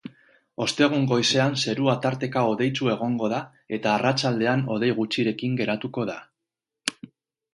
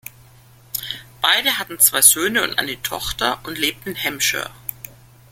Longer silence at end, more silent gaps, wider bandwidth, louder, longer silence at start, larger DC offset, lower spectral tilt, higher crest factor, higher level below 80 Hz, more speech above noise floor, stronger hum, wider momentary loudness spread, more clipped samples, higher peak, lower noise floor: first, 0.65 s vs 0.45 s; neither; second, 11.5 kHz vs 17 kHz; second, -24 LUFS vs -17 LUFS; about the same, 0.05 s vs 0.05 s; neither; first, -5 dB/octave vs 0 dB/octave; about the same, 22 dB vs 22 dB; second, -66 dBFS vs -48 dBFS; first, 62 dB vs 29 dB; neither; second, 10 LU vs 18 LU; neither; about the same, -2 dBFS vs 0 dBFS; first, -86 dBFS vs -48 dBFS